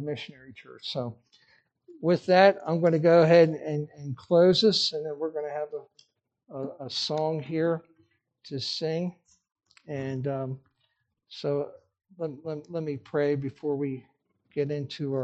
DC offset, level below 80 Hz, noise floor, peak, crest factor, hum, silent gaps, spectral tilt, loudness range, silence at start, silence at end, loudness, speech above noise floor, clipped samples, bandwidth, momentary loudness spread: under 0.1%; -72 dBFS; -75 dBFS; -6 dBFS; 22 dB; none; none; -6 dB/octave; 12 LU; 0 s; 0 s; -26 LUFS; 49 dB; under 0.1%; 8.6 kHz; 19 LU